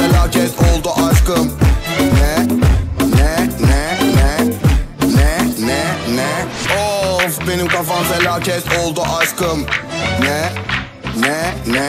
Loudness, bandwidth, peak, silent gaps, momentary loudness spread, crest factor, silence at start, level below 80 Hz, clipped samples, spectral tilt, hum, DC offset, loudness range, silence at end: -15 LUFS; 16.5 kHz; -2 dBFS; none; 5 LU; 12 dB; 0 s; -20 dBFS; under 0.1%; -5 dB/octave; none; under 0.1%; 2 LU; 0 s